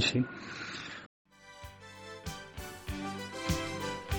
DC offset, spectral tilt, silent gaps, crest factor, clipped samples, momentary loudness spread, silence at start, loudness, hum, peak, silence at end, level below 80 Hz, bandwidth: under 0.1%; -4 dB/octave; 1.06-1.25 s; 22 dB; under 0.1%; 16 LU; 0 s; -38 LUFS; none; -16 dBFS; 0 s; -50 dBFS; over 20 kHz